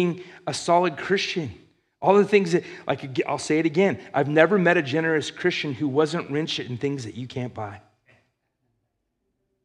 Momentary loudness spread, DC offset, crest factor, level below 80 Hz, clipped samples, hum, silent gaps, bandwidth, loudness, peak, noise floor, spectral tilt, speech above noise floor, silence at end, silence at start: 14 LU; under 0.1%; 22 dB; -70 dBFS; under 0.1%; none; none; 11 kHz; -23 LUFS; -2 dBFS; -76 dBFS; -5.5 dB/octave; 53 dB; 1.85 s; 0 s